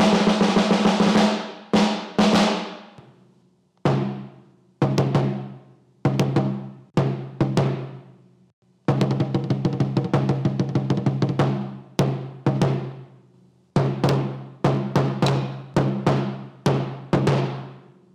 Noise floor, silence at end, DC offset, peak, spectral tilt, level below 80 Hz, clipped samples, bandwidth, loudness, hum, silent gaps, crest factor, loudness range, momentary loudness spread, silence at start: -60 dBFS; 0.35 s; under 0.1%; -10 dBFS; -6.5 dB/octave; -54 dBFS; under 0.1%; 11.5 kHz; -22 LUFS; none; 8.53-8.62 s; 12 dB; 4 LU; 11 LU; 0 s